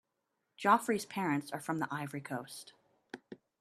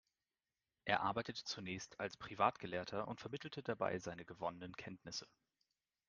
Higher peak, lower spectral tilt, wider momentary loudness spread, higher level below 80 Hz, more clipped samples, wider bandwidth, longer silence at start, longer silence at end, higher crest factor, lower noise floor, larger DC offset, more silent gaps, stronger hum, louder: first, -12 dBFS vs -18 dBFS; about the same, -5 dB/octave vs -4 dB/octave; first, 23 LU vs 11 LU; about the same, -80 dBFS vs -76 dBFS; neither; first, 14 kHz vs 9.6 kHz; second, 0.6 s vs 0.85 s; second, 0.25 s vs 0.85 s; about the same, 24 dB vs 28 dB; second, -84 dBFS vs under -90 dBFS; neither; neither; neither; first, -34 LUFS vs -43 LUFS